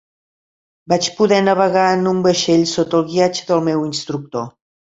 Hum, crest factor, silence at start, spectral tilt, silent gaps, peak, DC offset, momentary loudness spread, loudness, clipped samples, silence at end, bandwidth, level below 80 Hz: none; 16 dB; 0.9 s; -4.5 dB/octave; none; -2 dBFS; under 0.1%; 10 LU; -16 LUFS; under 0.1%; 0.45 s; 8 kHz; -58 dBFS